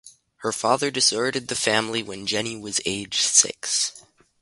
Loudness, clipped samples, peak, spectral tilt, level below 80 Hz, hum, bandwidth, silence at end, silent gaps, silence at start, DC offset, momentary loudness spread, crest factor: -22 LUFS; under 0.1%; -2 dBFS; -1 dB/octave; -62 dBFS; none; 12 kHz; 0.4 s; none; 0.05 s; under 0.1%; 10 LU; 22 dB